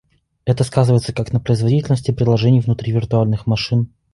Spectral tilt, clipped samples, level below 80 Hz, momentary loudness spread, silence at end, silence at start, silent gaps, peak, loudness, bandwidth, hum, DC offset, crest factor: -7.5 dB/octave; under 0.1%; -42 dBFS; 6 LU; 0.25 s; 0.45 s; none; -2 dBFS; -17 LUFS; 11.5 kHz; none; under 0.1%; 14 dB